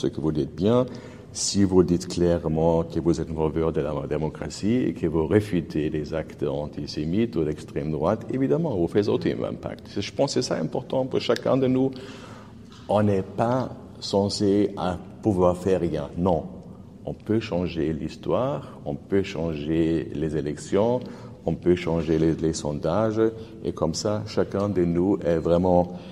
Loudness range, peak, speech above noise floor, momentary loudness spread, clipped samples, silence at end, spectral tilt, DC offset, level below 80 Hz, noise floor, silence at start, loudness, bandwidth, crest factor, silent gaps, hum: 3 LU; -4 dBFS; 20 dB; 10 LU; under 0.1%; 0 s; -6.5 dB/octave; under 0.1%; -46 dBFS; -44 dBFS; 0 s; -25 LUFS; 12.5 kHz; 20 dB; none; none